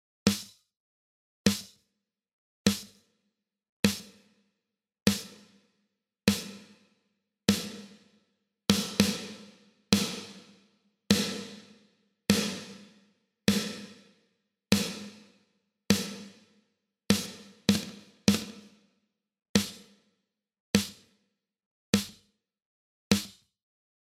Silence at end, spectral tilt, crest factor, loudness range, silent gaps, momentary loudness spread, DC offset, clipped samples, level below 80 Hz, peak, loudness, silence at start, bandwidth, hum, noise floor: 0.75 s; -4 dB/octave; 32 dB; 4 LU; 0.77-1.44 s, 2.33-2.65 s, 3.69-3.83 s, 5.02-5.06 s, 19.49-19.54 s, 20.60-20.74 s, 21.66-21.93 s, 22.65-23.10 s; 20 LU; under 0.1%; under 0.1%; -62 dBFS; -2 dBFS; -30 LUFS; 0.25 s; 16 kHz; none; -85 dBFS